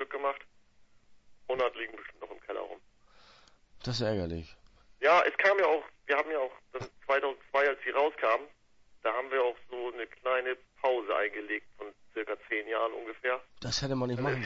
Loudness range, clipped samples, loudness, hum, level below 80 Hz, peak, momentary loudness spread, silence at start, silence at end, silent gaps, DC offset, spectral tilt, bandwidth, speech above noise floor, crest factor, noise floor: 9 LU; under 0.1%; -31 LUFS; none; -60 dBFS; -12 dBFS; 17 LU; 0 s; 0 s; none; under 0.1%; -4.5 dB/octave; 8 kHz; 29 dB; 20 dB; -60 dBFS